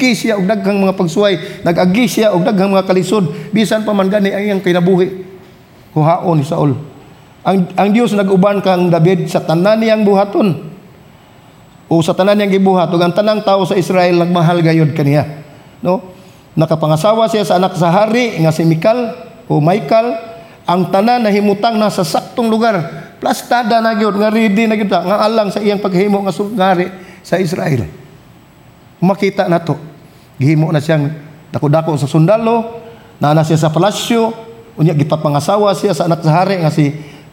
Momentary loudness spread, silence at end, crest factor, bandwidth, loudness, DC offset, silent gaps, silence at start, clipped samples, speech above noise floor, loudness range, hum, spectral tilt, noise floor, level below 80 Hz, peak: 8 LU; 0.15 s; 12 dB; 16.5 kHz; -13 LUFS; under 0.1%; none; 0 s; under 0.1%; 30 dB; 3 LU; none; -6.5 dB/octave; -42 dBFS; -54 dBFS; -2 dBFS